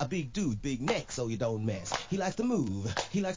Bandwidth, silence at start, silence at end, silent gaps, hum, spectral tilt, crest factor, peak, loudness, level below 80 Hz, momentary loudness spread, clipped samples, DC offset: 7.8 kHz; 0 s; 0 s; none; none; -5.5 dB/octave; 16 dB; -16 dBFS; -33 LUFS; -52 dBFS; 3 LU; under 0.1%; 0.2%